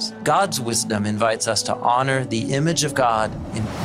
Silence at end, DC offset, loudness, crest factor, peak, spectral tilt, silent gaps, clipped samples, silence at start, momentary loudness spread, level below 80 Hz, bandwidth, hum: 0 s; under 0.1%; -21 LUFS; 16 dB; -4 dBFS; -4 dB/octave; none; under 0.1%; 0 s; 4 LU; -48 dBFS; 16 kHz; none